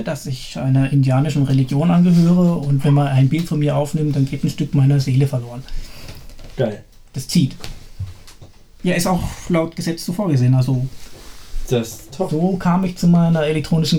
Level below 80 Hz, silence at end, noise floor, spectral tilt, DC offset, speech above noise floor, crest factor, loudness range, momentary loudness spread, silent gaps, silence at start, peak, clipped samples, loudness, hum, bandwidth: -36 dBFS; 0 s; -41 dBFS; -7 dB/octave; under 0.1%; 25 dB; 14 dB; 7 LU; 19 LU; none; 0 s; -4 dBFS; under 0.1%; -18 LUFS; none; 16.5 kHz